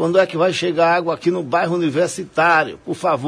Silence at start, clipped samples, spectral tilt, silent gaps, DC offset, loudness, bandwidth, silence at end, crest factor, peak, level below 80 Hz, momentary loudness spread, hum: 0 s; under 0.1%; -5 dB/octave; none; under 0.1%; -18 LUFS; 11 kHz; 0 s; 16 dB; -2 dBFS; -62 dBFS; 6 LU; none